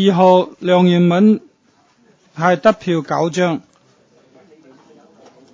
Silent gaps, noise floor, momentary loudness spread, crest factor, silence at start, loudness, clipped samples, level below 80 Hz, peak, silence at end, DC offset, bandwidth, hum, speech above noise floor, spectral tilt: none; -56 dBFS; 8 LU; 16 dB; 0 s; -15 LUFS; under 0.1%; -64 dBFS; 0 dBFS; 1.95 s; under 0.1%; 7.6 kHz; none; 43 dB; -7 dB/octave